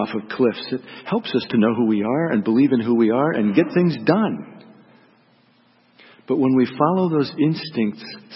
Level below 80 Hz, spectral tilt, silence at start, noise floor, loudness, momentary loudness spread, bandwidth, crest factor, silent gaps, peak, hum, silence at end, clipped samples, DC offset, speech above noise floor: -66 dBFS; -11.5 dB/octave; 0 s; -57 dBFS; -20 LUFS; 8 LU; 5.8 kHz; 18 dB; none; -2 dBFS; none; 0 s; under 0.1%; under 0.1%; 38 dB